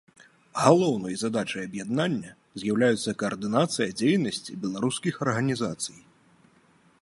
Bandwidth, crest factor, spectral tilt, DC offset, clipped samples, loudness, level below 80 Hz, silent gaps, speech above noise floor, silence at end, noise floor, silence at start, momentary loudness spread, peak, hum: 11.5 kHz; 22 dB; -5 dB/octave; under 0.1%; under 0.1%; -26 LUFS; -66 dBFS; none; 35 dB; 1 s; -61 dBFS; 0.55 s; 12 LU; -4 dBFS; none